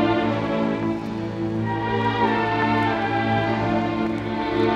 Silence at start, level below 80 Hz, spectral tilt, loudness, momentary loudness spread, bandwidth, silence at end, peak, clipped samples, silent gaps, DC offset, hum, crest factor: 0 s; -46 dBFS; -7.5 dB/octave; -23 LUFS; 5 LU; 8.6 kHz; 0 s; -8 dBFS; under 0.1%; none; under 0.1%; none; 14 dB